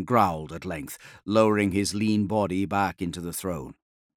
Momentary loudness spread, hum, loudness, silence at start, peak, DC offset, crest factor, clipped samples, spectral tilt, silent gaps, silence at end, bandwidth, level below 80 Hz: 14 LU; none; -26 LUFS; 0 s; -6 dBFS; under 0.1%; 20 dB; under 0.1%; -5.5 dB/octave; none; 0.45 s; 17.5 kHz; -56 dBFS